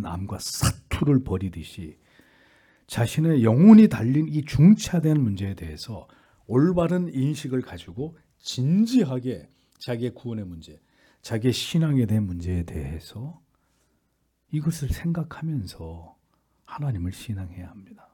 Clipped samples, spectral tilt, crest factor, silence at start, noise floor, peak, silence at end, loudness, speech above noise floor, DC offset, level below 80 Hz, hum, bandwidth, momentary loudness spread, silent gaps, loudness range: under 0.1%; -7 dB/octave; 22 dB; 0 s; -71 dBFS; -2 dBFS; 0.2 s; -23 LUFS; 49 dB; under 0.1%; -46 dBFS; none; 18 kHz; 21 LU; none; 13 LU